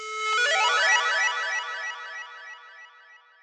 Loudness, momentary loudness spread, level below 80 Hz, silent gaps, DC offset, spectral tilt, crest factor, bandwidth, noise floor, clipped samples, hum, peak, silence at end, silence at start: -23 LUFS; 21 LU; under -90 dBFS; none; under 0.1%; 7 dB/octave; 16 dB; 11 kHz; -53 dBFS; under 0.1%; none; -10 dBFS; 0.25 s; 0 s